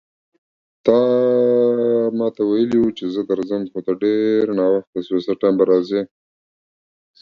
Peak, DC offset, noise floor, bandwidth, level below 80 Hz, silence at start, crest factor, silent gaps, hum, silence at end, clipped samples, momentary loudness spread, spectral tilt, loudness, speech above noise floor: 0 dBFS; under 0.1%; under -90 dBFS; 6.6 kHz; -60 dBFS; 0.85 s; 18 dB; 4.87-4.93 s; none; 1.15 s; under 0.1%; 8 LU; -8 dB/octave; -18 LUFS; over 72 dB